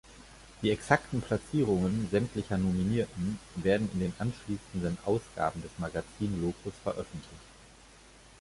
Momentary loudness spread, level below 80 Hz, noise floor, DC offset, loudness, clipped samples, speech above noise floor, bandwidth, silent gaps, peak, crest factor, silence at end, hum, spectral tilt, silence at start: 11 LU; -52 dBFS; -55 dBFS; under 0.1%; -32 LUFS; under 0.1%; 24 dB; 11.5 kHz; none; -8 dBFS; 24 dB; 0.75 s; none; -6.5 dB/octave; 0.05 s